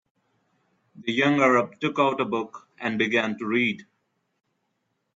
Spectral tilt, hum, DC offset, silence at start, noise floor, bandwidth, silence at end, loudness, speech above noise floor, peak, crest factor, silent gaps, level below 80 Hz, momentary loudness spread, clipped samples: -5.5 dB/octave; none; under 0.1%; 0.95 s; -76 dBFS; 7.8 kHz; 1.35 s; -24 LUFS; 52 dB; -6 dBFS; 20 dB; none; -72 dBFS; 12 LU; under 0.1%